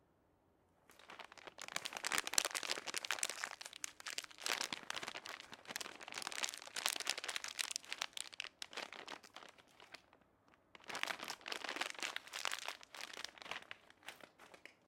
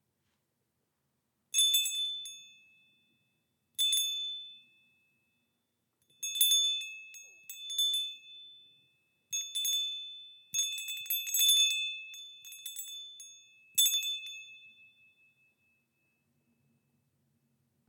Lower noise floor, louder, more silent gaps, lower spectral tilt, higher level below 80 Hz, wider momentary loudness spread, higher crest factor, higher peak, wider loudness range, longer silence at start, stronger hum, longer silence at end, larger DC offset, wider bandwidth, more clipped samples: second, -75 dBFS vs -81 dBFS; second, -43 LUFS vs -29 LUFS; neither; first, 1 dB/octave vs 6 dB/octave; first, -84 dBFS vs under -90 dBFS; second, 18 LU vs 22 LU; first, 36 dB vs 24 dB; about the same, -12 dBFS vs -12 dBFS; about the same, 7 LU vs 6 LU; second, 0.9 s vs 1.55 s; neither; second, 0.15 s vs 3.2 s; neither; about the same, 16.5 kHz vs 18 kHz; neither